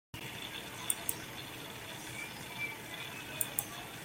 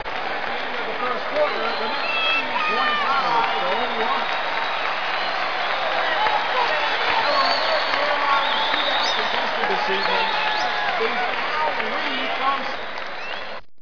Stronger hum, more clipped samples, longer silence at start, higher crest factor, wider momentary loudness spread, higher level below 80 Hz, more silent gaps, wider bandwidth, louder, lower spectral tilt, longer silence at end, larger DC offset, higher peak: neither; neither; first, 0.15 s vs 0 s; first, 30 dB vs 16 dB; about the same, 9 LU vs 7 LU; second, -66 dBFS vs -58 dBFS; neither; first, 17 kHz vs 5.4 kHz; second, -39 LUFS vs -21 LUFS; about the same, -1.5 dB/octave vs -2.5 dB/octave; about the same, 0 s vs 0 s; second, under 0.1% vs 3%; second, -12 dBFS vs -8 dBFS